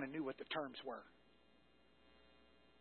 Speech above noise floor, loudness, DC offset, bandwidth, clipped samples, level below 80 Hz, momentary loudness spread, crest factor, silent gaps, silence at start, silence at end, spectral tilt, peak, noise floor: 25 dB; -47 LUFS; under 0.1%; 4.3 kHz; under 0.1%; -80 dBFS; 23 LU; 20 dB; none; 0 s; 0.35 s; -2.5 dB/octave; -30 dBFS; -72 dBFS